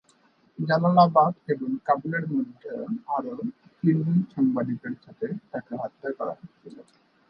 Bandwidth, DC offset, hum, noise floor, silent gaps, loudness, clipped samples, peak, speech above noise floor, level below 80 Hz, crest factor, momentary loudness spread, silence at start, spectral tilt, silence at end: 5.6 kHz; under 0.1%; none; -62 dBFS; none; -26 LUFS; under 0.1%; -6 dBFS; 37 dB; -72 dBFS; 20 dB; 16 LU; 0.6 s; -10 dB/octave; 0.5 s